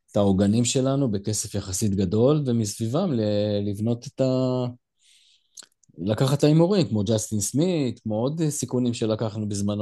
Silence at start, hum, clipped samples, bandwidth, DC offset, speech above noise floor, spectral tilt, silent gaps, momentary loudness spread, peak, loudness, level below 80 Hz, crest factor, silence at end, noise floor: 0.15 s; none; under 0.1%; 12.5 kHz; under 0.1%; 37 dB; -6 dB/octave; none; 7 LU; -6 dBFS; -24 LUFS; -58 dBFS; 18 dB; 0 s; -60 dBFS